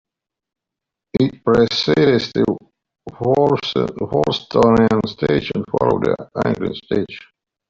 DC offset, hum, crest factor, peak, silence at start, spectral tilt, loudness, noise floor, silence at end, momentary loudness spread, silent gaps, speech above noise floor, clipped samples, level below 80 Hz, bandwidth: under 0.1%; none; 16 dB; -2 dBFS; 1.15 s; -7 dB/octave; -18 LUFS; -84 dBFS; 0.5 s; 8 LU; none; 67 dB; under 0.1%; -46 dBFS; 7.6 kHz